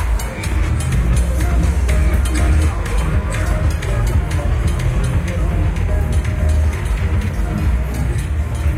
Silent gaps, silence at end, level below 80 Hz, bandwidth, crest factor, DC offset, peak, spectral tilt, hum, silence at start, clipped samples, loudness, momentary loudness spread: none; 0 s; -18 dBFS; 15 kHz; 12 dB; under 0.1%; -4 dBFS; -6 dB/octave; none; 0 s; under 0.1%; -18 LUFS; 4 LU